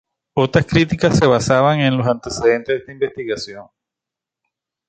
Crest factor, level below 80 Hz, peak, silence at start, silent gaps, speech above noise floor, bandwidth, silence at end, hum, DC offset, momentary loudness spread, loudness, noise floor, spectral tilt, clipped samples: 18 dB; -44 dBFS; 0 dBFS; 0.35 s; none; 69 dB; 9.4 kHz; 1.25 s; none; under 0.1%; 11 LU; -17 LUFS; -86 dBFS; -6 dB/octave; under 0.1%